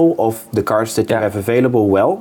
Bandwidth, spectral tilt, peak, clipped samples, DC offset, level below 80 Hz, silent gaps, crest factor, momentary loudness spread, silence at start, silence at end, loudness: 19 kHz; -6.5 dB/octave; -4 dBFS; under 0.1%; under 0.1%; -52 dBFS; none; 10 dB; 5 LU; 0 s; 0 s; -16 LUFS